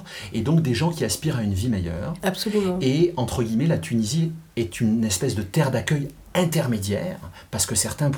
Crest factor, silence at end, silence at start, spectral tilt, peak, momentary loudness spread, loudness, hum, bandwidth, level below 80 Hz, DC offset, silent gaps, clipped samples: 18 dB; 0 s; 0 s; -5 dB/octave; -6 dBFS; 6 LU; -23 LUFS; none; over 20 kHz; -50 dBFS; under 0.1%; none; under 0.1%